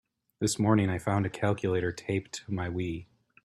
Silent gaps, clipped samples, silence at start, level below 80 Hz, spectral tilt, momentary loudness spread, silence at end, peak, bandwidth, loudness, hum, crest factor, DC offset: none; under 0.1%; 0.4 s; -58 dBFS; -6 dB/octave; 10 LU; 0.4 s; -10 dBFS; 13 kHz; -30 LUFS; none; 20 dB; under 0.1%